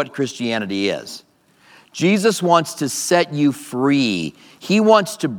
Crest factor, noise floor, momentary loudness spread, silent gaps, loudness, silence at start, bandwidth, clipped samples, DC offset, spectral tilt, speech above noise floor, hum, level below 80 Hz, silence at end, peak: 18 dB; -51 dBFS; 14 LU; none; -18 LUFS; 0 s; 19 kHz; under 0.1%; under 0.1%; -4.5 dB/octave; 33 dB; none; -68 dBFS; 0 s; 0 dBFS